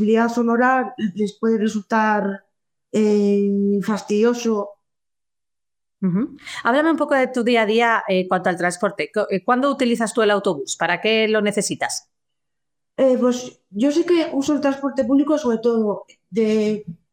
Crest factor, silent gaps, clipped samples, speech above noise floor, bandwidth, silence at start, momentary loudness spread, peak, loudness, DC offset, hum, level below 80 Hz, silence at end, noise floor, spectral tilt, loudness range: 14 dB; none; under 0.1%; 70 dB; 15.5 kHz; 0 s; 8 LU; -4 dBFS; -20 LUFS; under 0.1%; none; -66 dBFS; 0.15 s; -89 dBFS; -5 dB/octave; 3 LU